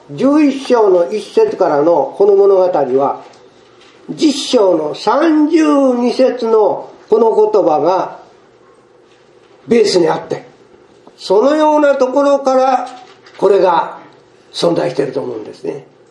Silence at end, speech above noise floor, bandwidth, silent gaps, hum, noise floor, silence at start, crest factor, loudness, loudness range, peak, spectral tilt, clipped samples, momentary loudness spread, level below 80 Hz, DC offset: 0.3 s; 35 dB; 11.5 kHz; none; none; -46 dBFS; 0.1 s; 14 dB; -12 LUFS; 4 LU; 0 dBFS; -5 dB/octave; under 0.1%; 14 LU; -64 dBFS; under 0.1%